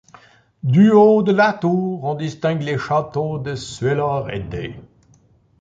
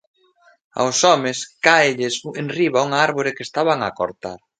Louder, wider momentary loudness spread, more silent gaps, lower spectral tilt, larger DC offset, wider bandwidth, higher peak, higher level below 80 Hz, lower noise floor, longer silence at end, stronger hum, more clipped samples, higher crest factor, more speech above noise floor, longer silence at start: about the same, -18 LUFS vs -18 LUFS; first, 15 LU vs 11 LU; neither; first, -7.5 dB/octave vs -3 dB/octave; neither; second, 7.8 kHz vs 9.6 kHz; about the same, -2 dBFS vs 0 dBFS; first, -50 dBFS vs -62 dBFS; about the same, -55 dBFS vs -56 dBFS; first, 0.75 s vs 0.25 s; neither; neither; about the same, 16 dB vs 20 dB; about the same, 37 dB vs 37 dB; about the same, 0.65 s vs 0.75 s